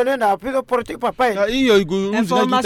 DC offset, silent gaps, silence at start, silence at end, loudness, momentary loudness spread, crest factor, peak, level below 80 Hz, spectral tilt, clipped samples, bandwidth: under 0.1%; none; 0 s; 0 s; -18 LUFS; 6 LU; 14 dB; -4 dBFS; -46 dBFS; -5 dB/octave; under 0.1%; 16 kHz